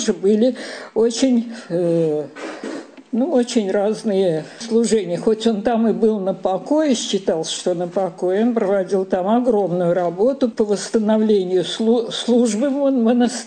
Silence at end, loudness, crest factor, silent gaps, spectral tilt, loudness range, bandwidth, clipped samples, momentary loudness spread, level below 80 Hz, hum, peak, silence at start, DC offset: 0 s; -19 LUFS; 14 dB; none; -5 dB/octave; 2 LU; 9.6 kHz; under 0.1%; 6 LU; -58 dBFS; none; -4 dBFS; 0 s; under 0.1%